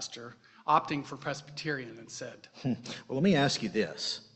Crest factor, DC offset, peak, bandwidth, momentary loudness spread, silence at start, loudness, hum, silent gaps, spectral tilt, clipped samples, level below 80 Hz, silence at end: 22 dB; under 0.1%; -10 dBFS; 8.4 kHz; 16 LU; 0 s; -31 LUFS; none; none; -4.5 dB/octave; under 0.1%; -66 dBFS; 0.1 s